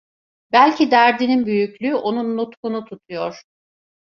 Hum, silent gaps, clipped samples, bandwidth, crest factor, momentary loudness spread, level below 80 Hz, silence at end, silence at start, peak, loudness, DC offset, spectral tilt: none; 2.57-2.63 s; under 0.1%; 6.8 kHz; 18 dB; 14 LU; -66 dBFS; 0.75 s; 0.55 s; -2 dBFS; -18 LUFS; under 0.1%; -5.5 dB/octave